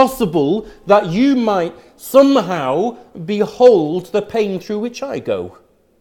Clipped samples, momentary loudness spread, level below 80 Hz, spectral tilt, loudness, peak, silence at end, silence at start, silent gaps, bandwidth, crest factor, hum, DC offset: under 0.1%; 13 LU; -50 dBFS; -6 dB/octave; -16 LUFS; 0 dBFS; 0.5 s; 0 s; none; 18 kHz; 16 dB; none; under 0.1%